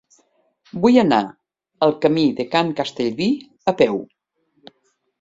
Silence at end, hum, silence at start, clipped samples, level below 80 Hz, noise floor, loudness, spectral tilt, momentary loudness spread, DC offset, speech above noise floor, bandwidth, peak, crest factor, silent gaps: 1.15 s; none; 0.75 s; under 0.1%; -60 dBFS; -67 dBFS; -19 LUFS; -6.5 dB/octave; 9 LU; under 0.1%; 49 dB; 7.8 kHz; -2 dBFS; 18 dB; none